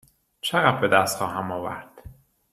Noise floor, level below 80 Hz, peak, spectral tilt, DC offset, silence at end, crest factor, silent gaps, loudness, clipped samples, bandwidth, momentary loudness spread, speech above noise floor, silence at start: -47 dBFS; -58 dBFS; -2 dBFS; -4 dB/octave; under 0.1%; 0.4 s; 24 dB; none; -23 LUFS; under 0.1%; 15.5 kHz; 13 LU; 25 dB; 0.45 s